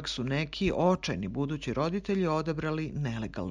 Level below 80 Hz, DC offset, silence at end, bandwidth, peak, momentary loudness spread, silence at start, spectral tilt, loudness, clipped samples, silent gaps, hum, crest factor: -50 dBFS; under 0.1%; 0 s; 10 kHz; -12 dBFS; 6 LU; 0 s; -6.5 dB/octave; -31 LUFS; under 0.1%; none; none; 18 dB